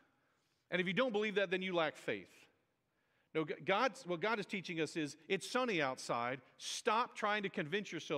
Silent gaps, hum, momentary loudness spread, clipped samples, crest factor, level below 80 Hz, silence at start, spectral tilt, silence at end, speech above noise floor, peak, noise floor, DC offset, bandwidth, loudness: none; none; 8 LU; under 0.1%; 20 dB; -88 dBFS; 0.7 s; -4 dB/octave; 0 s; 43 dB; -18 dBFS; -81 dBFS; under 0.1%; 15 kHz; -38 LUFS